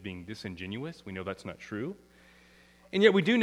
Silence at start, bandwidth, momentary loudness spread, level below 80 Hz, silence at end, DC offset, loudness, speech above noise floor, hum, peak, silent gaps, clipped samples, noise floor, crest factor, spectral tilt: 0 s; 11.5 kHz; 18 LU; -66 dBFS; 0 s; under 0.1%; -31 LUFS; 29 dB; none; -8 dBFS; none; under 0.1%; -59 dBFS; 24 dB; -6 dB/octave